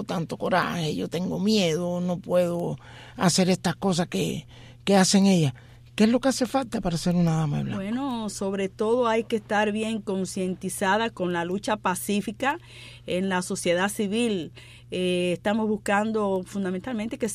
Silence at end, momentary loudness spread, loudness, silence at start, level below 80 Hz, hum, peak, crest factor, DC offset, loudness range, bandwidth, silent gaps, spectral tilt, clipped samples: 0 s; 9 LU; -25 LUFS; 0 s; -54 dBFS; none; -6 dBFS; 20 dB; under 0.1%; 4 LU; 15.5 kHz; none; -5 dB/octave; under 0.1%